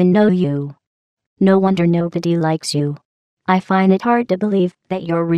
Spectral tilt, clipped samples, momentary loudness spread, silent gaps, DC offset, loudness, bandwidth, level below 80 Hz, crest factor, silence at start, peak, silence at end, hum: -7 dB/octave; under 0.1%; 11 LU; 0.87-1.17 s, 1.26-1.36 s, 3.05-3.37 s; under 0.1%; -17 LUFS; 11.5 kHz; -64 dBFS; 14 dB; 0 s; -2 dBFS; 0 s; none